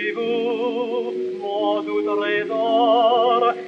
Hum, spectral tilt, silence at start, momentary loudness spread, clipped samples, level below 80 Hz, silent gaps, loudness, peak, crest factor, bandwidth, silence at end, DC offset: none; -5.5 dB/octave; 0 s; 9 LU; under 0.1%; -84 dBFS; none; -20 LUFS; -6 dBFS; 14 dB; 7.2 kHz; 0 s; under 0.1%